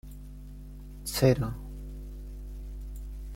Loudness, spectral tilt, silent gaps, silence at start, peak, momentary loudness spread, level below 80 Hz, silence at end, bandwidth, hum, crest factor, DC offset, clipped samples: -30 LUFS; -6 dB/octave; none; 0.05 s; -10 dBFS; 22 LU; -40 dBFS; 0 s; 16.5 kHz; 50 Hz at -40 dBFS; 22 dB; under 0.1%; under 0.1%